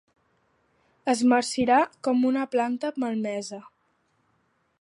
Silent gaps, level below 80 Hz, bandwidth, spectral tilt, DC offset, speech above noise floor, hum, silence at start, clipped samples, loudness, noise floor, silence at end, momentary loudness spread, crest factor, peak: none; -66 dBFS; 11 kHz; -4 dB/octave; under 0.1%; 46 dB; none; 1.05 s; under 0.1%; -25 LUFS; -70 dBFS; 1.2 s; 12 LU; 18 dB; -8 dBFS